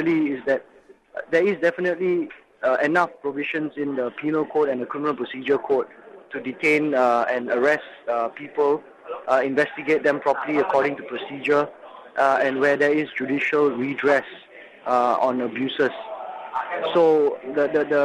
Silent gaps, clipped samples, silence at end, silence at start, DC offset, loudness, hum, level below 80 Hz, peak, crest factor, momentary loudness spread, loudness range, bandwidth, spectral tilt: none; under 0.1%; 0 s; 0 s; under 0.1%; -22 LUFS; none; -68 dBFS; -4 dBFS; 18 dB; 12 LU; 2 LU; 10.5 kHz; -6 dB/octave